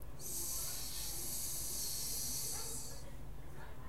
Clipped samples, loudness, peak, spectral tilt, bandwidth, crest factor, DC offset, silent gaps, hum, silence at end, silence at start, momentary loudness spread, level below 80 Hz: under 0.1%; -40 LUFS; -28 dBFS; -1.5 dB/octave; 16 kHz; 14 dB; 0.6%; none; none; 0 s; 0 s; 15 LU; -54 dBFS